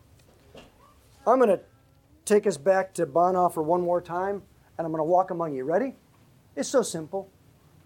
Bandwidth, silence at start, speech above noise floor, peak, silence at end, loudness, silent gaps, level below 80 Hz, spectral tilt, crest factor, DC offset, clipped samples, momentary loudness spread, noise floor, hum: 17 kHz; 0.55 s; 35 dB; -8 dBFS; 0.6 s; -25 LUFS; none; -64 dBFS; -5.5 dB/octave; 18 dB; under 0.1%; under 0.1%; 13 LU; -59 dBFS; none